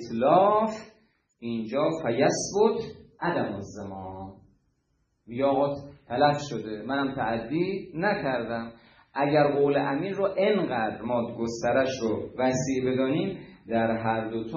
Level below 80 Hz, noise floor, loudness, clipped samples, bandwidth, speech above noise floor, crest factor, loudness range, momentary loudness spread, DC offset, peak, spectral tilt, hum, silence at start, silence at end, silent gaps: -62 dBFS; -73 dBFS; -27 LUFS; under 0.1%; 8.8 kHz; 46 dB; 20 dB; 4 LU; 15 LU; under 0.1%; -8 dBFS; -5.5 dB/octave; none; 0 s; 0 s; none